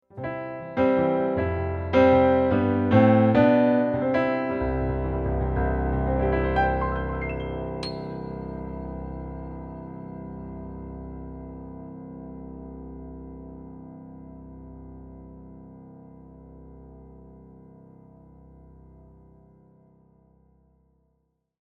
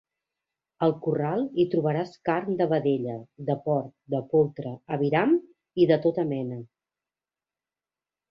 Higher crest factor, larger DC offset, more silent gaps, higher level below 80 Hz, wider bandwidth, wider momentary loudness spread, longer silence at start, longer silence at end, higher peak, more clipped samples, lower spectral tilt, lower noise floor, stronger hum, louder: about the same, 20 dB vs 20 dB; neither; neither; first, -38 dBFS vs -68 dBFS; about the same, 6.2 kHz vs 6 kHz; first, 25 LU vs 10 LU; second, 0.15 s vs 0.8 s; first, 4.15 s vs 1.65 s; about the same, -6 dBFS vs -8 dBFS; neither; about the same, -9.5 dB/octave vs -9.5 dB/octave; second, -73 dBFS vs under -90 dBFS; neither; about the same, -24 LUFS vs -26 LUFS